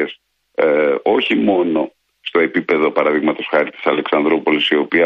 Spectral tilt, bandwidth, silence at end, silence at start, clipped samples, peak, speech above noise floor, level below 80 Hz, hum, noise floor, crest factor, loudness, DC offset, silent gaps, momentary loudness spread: -6.5 dB/octave; 5.8 kHz; 0 s; 0 s; under 0.1%; -2 dBFS; 24 dB; -60 dBFS; none; -39 dBFS; 14 dB; -16 LUFS; under 0.1%; none; 6 LU